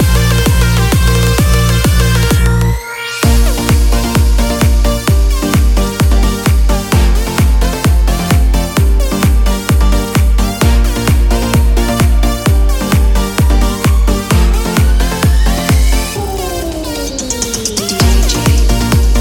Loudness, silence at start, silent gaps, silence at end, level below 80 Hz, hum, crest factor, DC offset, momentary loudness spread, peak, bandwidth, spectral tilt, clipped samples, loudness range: -12 LUFS; 0 s; none; 0 s; -12 dBFS; none; 10 dB; under 0.1%; 4 LU; 0 dBFS; 17.5 kHz; -5 dB/octave; under 0.1%; 2 LU